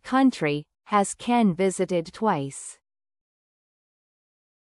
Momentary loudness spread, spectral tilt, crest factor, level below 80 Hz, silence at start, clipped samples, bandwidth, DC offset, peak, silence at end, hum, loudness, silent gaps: 12 LU; -5.5 dB/octave; 18 dB; -66 dBFS; 0.05 s; under 0.1%; 12 kHz; under 0.1%; -8 dBFS; 2.05 s; none; -24 LUFS; none